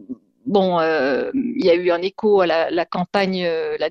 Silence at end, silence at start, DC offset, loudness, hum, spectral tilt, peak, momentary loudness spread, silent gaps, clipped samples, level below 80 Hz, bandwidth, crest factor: 0 s; 0 s; under 0.1%; -19 LUFS; none; -7 dB/octave; -4 dBFS; 6 LU; none; under 0.1%; -60 dBFS; 7 kHz; 16 dB